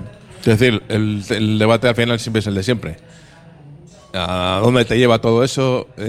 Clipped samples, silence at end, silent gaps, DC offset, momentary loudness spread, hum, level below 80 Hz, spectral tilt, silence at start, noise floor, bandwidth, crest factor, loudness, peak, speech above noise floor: under 0.1%; 0 s; none; under 0.1%; 9 LU; none; -44 dBFS; -6 dB/octave; 0 s; -42 dBFS; 14.5 kHz; 16 dB; -16 LUFS; 0 dBFS; 27 dB